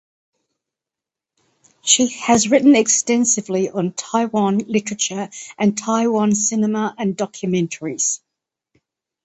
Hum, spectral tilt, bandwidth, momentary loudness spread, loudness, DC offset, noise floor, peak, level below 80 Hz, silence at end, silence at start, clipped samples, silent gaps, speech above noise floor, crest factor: none; -3.5 dB/octave; 8.8 kHz; 10 LU; -18 LUFS; under 0.1%; -87 dBFS; 0 dBFS; -62 dBFS; 1.1 s; 1.85 s; under 0.1%; none; 69 dB; 20 dB